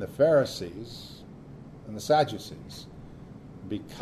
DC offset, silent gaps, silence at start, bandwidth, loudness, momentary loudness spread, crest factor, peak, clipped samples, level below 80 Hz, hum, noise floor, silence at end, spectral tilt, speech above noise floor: under 0.1%; none; 0 s; 13.5 kHz; -27 LUFS; 24 LU; 18 dB; -12 dBFS; under 0.1%; -56 dBFS; none; -46 dBFS; 0 s; -5.5 dB/octave; 18 dB